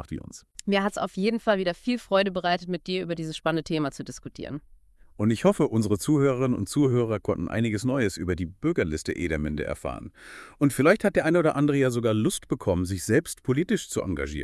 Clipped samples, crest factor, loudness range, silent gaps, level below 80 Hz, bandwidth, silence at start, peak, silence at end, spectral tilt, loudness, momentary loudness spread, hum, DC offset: under 0.1%; 20 dB; 5 LU; none; -50 dBFS; 12 kHz; 0 s; -6 dBFS; 0 s; -6 dB/octave; -26 LUFS; 14 LU; none; under 0.1%